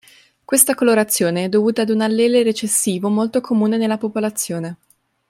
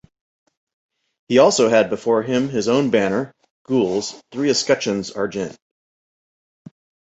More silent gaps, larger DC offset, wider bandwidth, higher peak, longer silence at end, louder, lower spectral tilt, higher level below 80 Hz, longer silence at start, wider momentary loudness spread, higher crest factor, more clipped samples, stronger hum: second, none vs 3.50-3.65 s; neither; first, 16.5 kHz vs 8.2 kHz; about the same, 0 dBFS vs -2 dBFS; second, 0.55 s vs 1.65 s; about the same, -17 LUFS vs -19 LUFS; about the same, -4 dB/octave vs -4.5 dB/octave; second, -66 dBFS vs -60 dBFS; second, 0.5 s vs 1.3 s; second, 7 LU vs 11 LU; about the same, 18 dB vs 18 dB; neither; neither